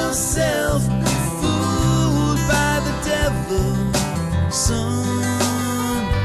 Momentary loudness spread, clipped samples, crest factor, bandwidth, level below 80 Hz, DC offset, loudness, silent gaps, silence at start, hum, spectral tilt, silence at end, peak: 4 LU; under 0.1%; 12 dB; 13 kHz; -30 dBFS; under 0.1%; -20 LUFS; none; 0 s; none; -4.5 dB/octave; 0 s; -6 dBFS